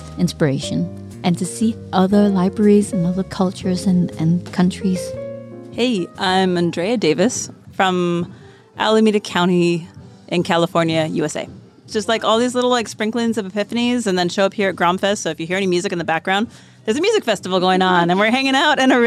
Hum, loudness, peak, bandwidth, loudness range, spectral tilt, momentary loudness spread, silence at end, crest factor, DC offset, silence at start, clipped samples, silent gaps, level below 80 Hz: none; -18 LUFS; -2 dBFS; 13 kHz; 2 LU; -5 dB/octave; 9 LU; 0 s; 14 dB; under 0.1%; 0 s; under 0.1%; none; -52 dBFS